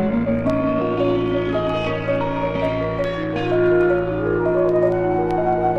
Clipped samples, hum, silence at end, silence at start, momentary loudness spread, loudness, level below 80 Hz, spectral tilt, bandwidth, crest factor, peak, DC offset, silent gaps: under 0.1%; none; 0 s; 0 s; 5 LU; -20 LUFS; -40 dBFS; -8.5 dB/octave; 6.8 kHz; 14 dB; -6 dBFS; under 0.1%; none